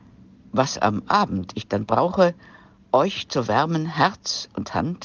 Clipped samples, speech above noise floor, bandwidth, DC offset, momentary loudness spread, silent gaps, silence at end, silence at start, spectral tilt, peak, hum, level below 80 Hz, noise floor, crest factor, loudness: under 0.1%; 27 dB; 10 kHz; under 0.1%; 7 LU; none; 0 s; 0.55 s; -5 dB/octave; -4 dBFS; none; -56 dBFS; -49 dBFS; 18 dB; -22 LUFS